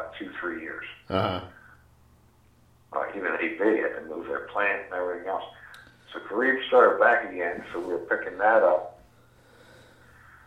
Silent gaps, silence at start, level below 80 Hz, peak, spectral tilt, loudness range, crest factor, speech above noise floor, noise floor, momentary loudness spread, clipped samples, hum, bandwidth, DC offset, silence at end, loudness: none; 0 s; -64 dBFS; -6 dBFS; -6.5 dB/octave; 8 LU; 22 dB; 34 dB; -59 dBFS; 17 LU; under 0.1%; none; 8.6 kHz; under 0.1%; 1.5 s; -26 LUFS